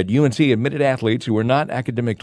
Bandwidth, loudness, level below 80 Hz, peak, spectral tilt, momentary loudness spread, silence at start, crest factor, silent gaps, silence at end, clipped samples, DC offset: 11 kHz; -19 LUFS; -58 dBFS; -4 dBFS; -7 dB/octave; 6 LU; 0 s; 16 dB; none; 0.05 s; under 0.1%; under 0.1%